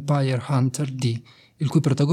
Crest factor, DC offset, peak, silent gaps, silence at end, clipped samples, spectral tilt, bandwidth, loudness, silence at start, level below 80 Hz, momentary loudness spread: 16 dB; under 0.1%; -8 dBFS; none; 0 s; under 0.1%; -7 dB/octave; 13 kHz; -24 LUFS; 0 s; -62 dBFS; 7 LU